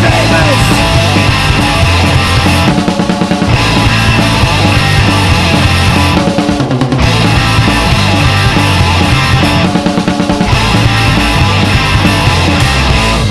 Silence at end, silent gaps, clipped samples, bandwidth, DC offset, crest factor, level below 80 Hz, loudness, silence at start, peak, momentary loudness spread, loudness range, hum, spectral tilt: 0 s; none; 0.1%; 14 kHz; under 0.1%; 8 dB; -18 dBFS; -8 LUFS; 0 s; 0 dBFS; 3 LU; 1 LU; none; -5 dB/octave